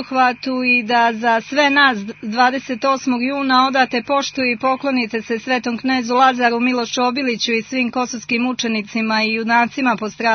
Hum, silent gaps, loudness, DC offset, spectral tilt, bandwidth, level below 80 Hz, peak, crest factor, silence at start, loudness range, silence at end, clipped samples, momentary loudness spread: 50 Hz at -55 dBFS; none; -17 LUFS; under 0.1%; -3.5 dB/octave; 6.6 kHz; -62 dBFS; 0 dBFS; 16 dB; 0 s; 2 LU; 0 s; under 0.1%; 6 LU